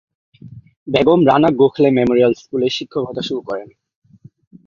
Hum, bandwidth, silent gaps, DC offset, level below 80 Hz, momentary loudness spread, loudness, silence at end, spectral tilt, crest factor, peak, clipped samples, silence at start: none; 7.4 kHz; 0.77-0.86 s; under 0.1%; -52 dBFS; 12 LU; -15 LUFS; 1 s; -7 dB/octave; 16 dB; -2 dBFS; under 0.1%; 0.45 s